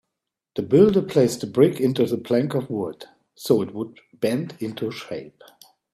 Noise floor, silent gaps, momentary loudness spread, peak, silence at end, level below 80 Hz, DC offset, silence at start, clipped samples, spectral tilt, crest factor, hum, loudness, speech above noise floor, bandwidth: -83 dBFS; none; 17 LU; -2 dBFS; 0.65 s; -60 dBFS; under 0.1%; 0.55 s; under 0.1%; -6.5 dB/octave; 20 dB; none; -22 LUFS; 62 dB; 15 kHz